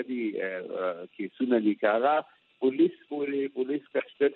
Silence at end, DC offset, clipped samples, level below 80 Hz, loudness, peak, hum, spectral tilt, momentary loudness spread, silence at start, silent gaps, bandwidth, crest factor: 0 s; under 0.1%; under 0.1%; -88 dBFS; -29 LUFS; -10 dBFS; none; -4 dB/octave; 8 LU; 0 s; none; 4.2 kHz; 18 dB